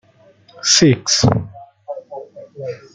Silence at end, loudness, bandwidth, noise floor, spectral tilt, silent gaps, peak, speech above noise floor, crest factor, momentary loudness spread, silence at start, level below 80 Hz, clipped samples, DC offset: 0.15 s; -14 LUFS; 11 kHz; -50 dBFS; -3.5 dB/octave; none; 0 dBFS; 35 dB; 18 dB; 23 LU; 0.55 s; -46 dBFS; under 0.1%; under 0.1%